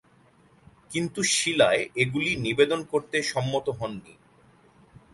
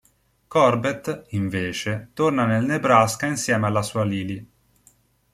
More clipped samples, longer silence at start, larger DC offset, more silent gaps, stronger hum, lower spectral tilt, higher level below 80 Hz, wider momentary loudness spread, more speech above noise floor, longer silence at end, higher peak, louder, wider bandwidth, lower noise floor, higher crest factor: neither; first, 0.9 s vs 0.5 s; neither; neither; neither; second, -3.5 dB/octave vs -5.5 dB/octave; about the same, -60 dBFS vs -58 dBFS; about the same, 12 LU vs 11 LU; second, 34 dB vs 38 dB; about the same, 1 s vs 0.9 s; about the same, -6 dBFS vs -4 dBFS; second, -25 LUFS vs -22 LUFS; second, 11.5 kHz vs 15 kHz; about the same, -59 dBFS vs -59 dBFS; about the same, 20 dB vs 20 dB